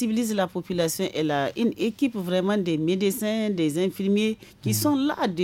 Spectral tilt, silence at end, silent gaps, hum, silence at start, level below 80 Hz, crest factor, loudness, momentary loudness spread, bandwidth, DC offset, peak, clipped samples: -5 dB/octave; 0 s; none; none; 0 s; -62 dBFS; 14 dB; -25 LUFS; 4 LU; 17 kHz; under 0.1%; -12 dBFS; under 0.1%